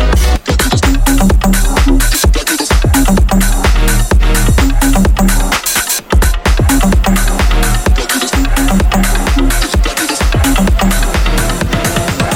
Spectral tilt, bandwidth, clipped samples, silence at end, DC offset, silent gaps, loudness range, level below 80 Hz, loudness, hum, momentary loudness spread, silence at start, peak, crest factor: -4 dB/octave; 17 kHz; under 0.1%; 0 s; under 0.1%; none; 1 LU; -12 dBFS; -11 LUFS; none; 3 LU; 0 s; 0 dBFS; 10 dB